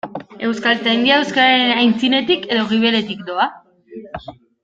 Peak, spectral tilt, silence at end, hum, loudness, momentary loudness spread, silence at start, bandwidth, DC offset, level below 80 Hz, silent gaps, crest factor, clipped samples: -2 dBFS; -4.5 dB/octave; 0.3 s; none; -16 LUFS; 18 LU; 0.05 s; 7.8 kHz; under 0.1%; -56 dBFS; none; 16 dB; under 0.1%